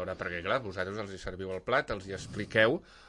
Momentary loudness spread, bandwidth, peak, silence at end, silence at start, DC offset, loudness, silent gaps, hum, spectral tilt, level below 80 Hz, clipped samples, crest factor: 13 LU; 11 kHz; -12 dBFS; 0 s; 0 s; under 0.1%; -32 LUFS; none; none; -5 dB/octave; -56 dBFS; under 0.1%; 22 dB